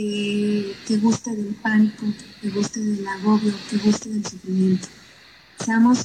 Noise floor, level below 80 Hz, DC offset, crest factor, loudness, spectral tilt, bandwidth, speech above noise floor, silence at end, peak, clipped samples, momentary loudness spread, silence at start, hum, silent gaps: -48 dBFS; -60 dBFS; under 0.1%; 14 dB; -22 LUFS; -5.5 dB/octave; 9.8 kHz; 27 dB; 0 s; -6 dBFS; under 0.1%; 9 LU; 0 s; none; none